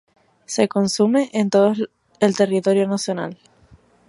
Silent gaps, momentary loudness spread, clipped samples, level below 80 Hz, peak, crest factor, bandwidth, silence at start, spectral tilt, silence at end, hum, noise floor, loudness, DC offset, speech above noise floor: none; 10 LU; under 0.1%; -64 dBFS; -2 dBFS; 18 dB; 11.5 kHz; 0.5 s; -5 dB/octave; 0.75 s; none; -52 dBFS; -19 LUFS; under 0.1%; 34 dB